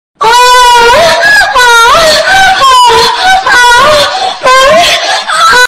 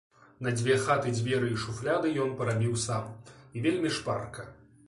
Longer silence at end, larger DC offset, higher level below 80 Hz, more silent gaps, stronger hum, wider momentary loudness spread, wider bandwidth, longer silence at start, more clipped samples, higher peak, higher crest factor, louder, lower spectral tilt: second, 0 s vs 0.35 s; neither; first, -30 dBFS vs -60 dBFS; neither; neither; second, 4 LU vs 16 LU; first, 16.5 kHz vs 11.5 kHz; second, 0.2 s vs 0.4 s; first, 0.6% vs under 0.1%; first, 0 dBFS vs -12 dBFS; second, 4 dB vs 18 dB; first, -3 LUFS vs -30 LUFS; second, -0.5 dB/octave vs -5.5 dB/octave